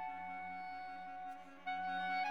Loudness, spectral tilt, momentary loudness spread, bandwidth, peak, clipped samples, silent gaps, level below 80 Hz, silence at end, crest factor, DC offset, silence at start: -44 LUFS; -4 dB/octave; 9 LU; 7.2 kHz; -28 dBFS; under 0.1%; none; -84 dBFS; 0 s; 14 dB; under 0.1%; 0 s